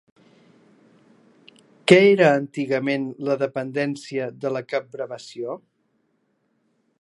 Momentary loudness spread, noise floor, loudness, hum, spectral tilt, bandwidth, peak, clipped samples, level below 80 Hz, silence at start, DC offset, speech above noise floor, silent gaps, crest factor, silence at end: 18 LU; -69 dBFS; -22 LUFS; none; -6 dB/octave; 11.5 kHz; 0 dBFS; under 0.1%; -70 dBFS; 1.85 s; under 0.1%; 48 dB; none; 24 dB; 1.45 s